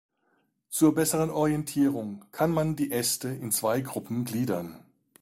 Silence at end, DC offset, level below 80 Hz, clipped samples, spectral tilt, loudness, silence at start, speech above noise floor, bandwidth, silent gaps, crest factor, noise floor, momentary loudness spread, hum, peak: 0.4 s; under 0.1%; -60 dBFS; under 0.1%; -5 dB/octave; -27 LUFS; 0.7 s; 45 dB; 16 kHz; none; 18 dB; -72 dBFS; 10 LU; none; -10 dBFS